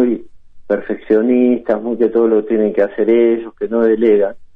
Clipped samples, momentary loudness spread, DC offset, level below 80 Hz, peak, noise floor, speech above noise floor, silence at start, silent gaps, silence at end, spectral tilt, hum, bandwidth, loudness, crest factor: under 0.1%; 8 LU; under 0.1%; -52 dBFS; -2 dBFS; -34 dBFS; 21 dB; 0 s; none; 0.1 s; -9.5 dB/octave; none; 3.8 kHz; -15 LUFS; 12 dB